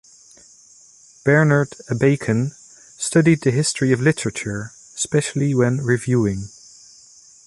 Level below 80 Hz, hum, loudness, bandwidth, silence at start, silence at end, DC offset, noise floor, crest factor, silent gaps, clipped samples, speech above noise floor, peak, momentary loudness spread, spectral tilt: -52 dBFS; none; -19 LUFS; 11.5 kHz; 1.25 s; 1 s; under 0.1%; -49 dBFS; 18 dB; none; under 0.1%; 31 dB; -4 dBFS; 12 LU; -5.5 dB/octave